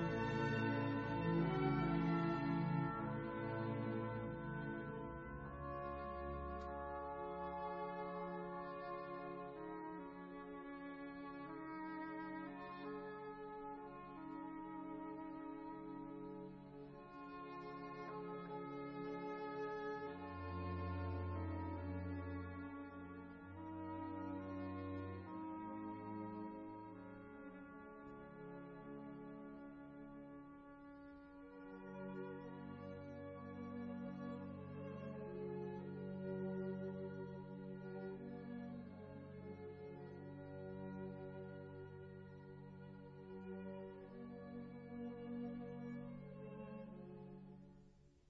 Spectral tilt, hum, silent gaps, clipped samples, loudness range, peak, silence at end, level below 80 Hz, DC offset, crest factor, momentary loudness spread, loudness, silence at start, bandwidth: -7 dB/octave; none; none; under 0.1%; 10 LU; -28 dBFS; 0.1 s; -66 dBFS; under 0.1%; 20 dB; 15 LU; -48 LUFS; 0 s; 6.2 kHz